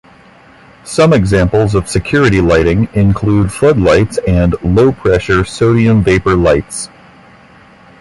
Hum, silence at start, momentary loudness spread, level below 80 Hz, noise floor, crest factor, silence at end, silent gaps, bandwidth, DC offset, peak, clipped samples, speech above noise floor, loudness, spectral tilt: none; 0.85 s; 5 LU; -26 dBFS; -41 dBFS; 12 dB; 1.15 s; none; 11.5 kHz; under 0.1%; 0 dBFS; under 0.1%; 31 dB; -11 LUFS; -6.5 dB/octave